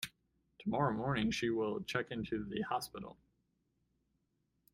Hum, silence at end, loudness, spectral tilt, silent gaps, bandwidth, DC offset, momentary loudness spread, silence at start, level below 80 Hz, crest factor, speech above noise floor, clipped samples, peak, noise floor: none; 1.6 s; -38 LUFS; -5.5 dB/octave; none; 16 kHz; under 0.1%; 12 LU; 0 s; -64 dBFS; 22 dB; 44 dB; under 0.1%; -18 dBFS; -81 dBFS